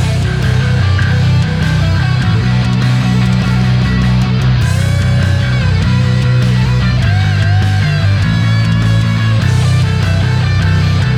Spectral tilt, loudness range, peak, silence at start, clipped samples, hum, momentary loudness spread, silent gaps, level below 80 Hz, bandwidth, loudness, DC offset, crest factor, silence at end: -6.5 dB/octave; 0 LU; 0 dBFS; 0 s; under 0.1%; none; 1 LU; none; -24 dBFS; 11.5 kHz; -12 LUFS; under 0.1%; 10 dB; 0 s